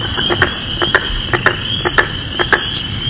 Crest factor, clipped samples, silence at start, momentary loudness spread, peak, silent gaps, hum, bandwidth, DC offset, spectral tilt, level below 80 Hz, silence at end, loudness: 16 dB; 0.2%; 0 s; 4 LU; 0 dBFS; none; none; 4 kHz; under 0.1%; -8 dB/octave; -30 dBFS; 0 s; -15 LUFS